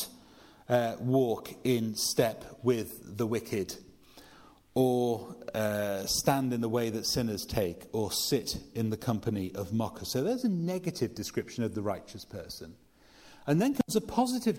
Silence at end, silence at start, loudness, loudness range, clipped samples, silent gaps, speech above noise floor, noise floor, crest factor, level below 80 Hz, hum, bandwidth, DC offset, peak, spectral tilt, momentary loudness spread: 0 s; 0 s; -31 LUFS; 4 LU; under 0.1%; none; 26 dB; -57 dBFS; 20 dB; -58 dBFS; none; 16.5 kHz; under 0.1%; -10 dBFS; -5 dB/octave; 10 LU